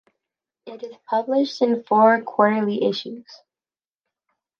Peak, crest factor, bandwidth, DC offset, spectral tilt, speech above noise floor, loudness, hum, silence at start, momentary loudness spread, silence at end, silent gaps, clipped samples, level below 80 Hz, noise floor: -4 dBFS; 20 dB; 7 kHz; under 0.1%; -6 dB/octave; over 70 dB; -20 LUFS; none; 0.65 s; 21 LU; 1.25 s; none; under 0.1%; -76 dBFS; under -90 dBFS